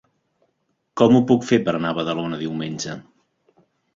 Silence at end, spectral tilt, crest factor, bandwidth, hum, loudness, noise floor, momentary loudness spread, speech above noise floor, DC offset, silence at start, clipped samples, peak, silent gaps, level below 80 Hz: 0.95 s; -6 dB/octave; 20 dB; 7.6 kHz; none; -20 LUFS; -71 dBFS; 15 LU; 52 dB; under 0.1%; 0.95 s; under 0.1%; -2 dBFS; none; -60 dBFS